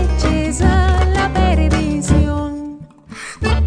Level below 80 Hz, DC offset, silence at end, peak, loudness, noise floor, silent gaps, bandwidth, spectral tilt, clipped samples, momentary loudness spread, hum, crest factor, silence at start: -18 dBFS; under 0.1%; 0 s; 0 dBFS; -16 LUFS; -35 dBFS; none; 10 kHz; -6 dB/octave; under 0.1%; 17 LU; none; 14 dB; 0 s